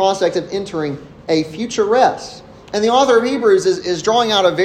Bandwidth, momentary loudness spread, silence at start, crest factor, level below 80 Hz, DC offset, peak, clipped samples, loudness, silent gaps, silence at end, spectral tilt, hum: 13.5 kHz; 11 LU; 0 s; 16 dB; -52 dBFS; under 0.1%; 0 dBFS; under 0.1%; -16 LUFS; none; 0 s; -4 dB/octave; none